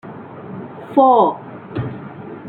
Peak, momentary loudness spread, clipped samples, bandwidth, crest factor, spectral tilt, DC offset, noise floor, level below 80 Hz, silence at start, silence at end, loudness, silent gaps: -2 dBFS; 21 LU; under 0.1%; 4.3 kHz; 18 dB; -10 dB/octave; under 0.1%; -33 dBFS; -54 dBFS; 0.05 s; 0 s; -16 LUFS; none